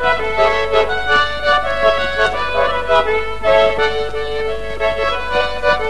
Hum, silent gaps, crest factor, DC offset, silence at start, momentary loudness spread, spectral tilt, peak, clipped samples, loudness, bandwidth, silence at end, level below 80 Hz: none; none; 16 dB; 6%; 0 s; 7 LU; -3.5 dB/octave; 0 dBFS; under 0.1%; -16 LUFS; 12 kHz; 0 s; -32 dBFS